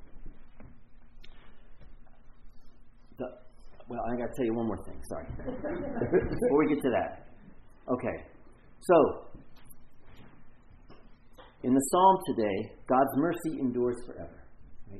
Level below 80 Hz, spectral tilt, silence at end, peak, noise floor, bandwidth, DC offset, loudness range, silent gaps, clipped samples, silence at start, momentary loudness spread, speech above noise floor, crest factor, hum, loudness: -50 dBFS; -6 dB/octave; 0 s; -10 dBFS; -52 dBFS; 12 kHz; under 0.1%; 12 LU; none; under 0.1%; 0 s; 18 LU; 24 dB; 22 dB; none; -29 LUFS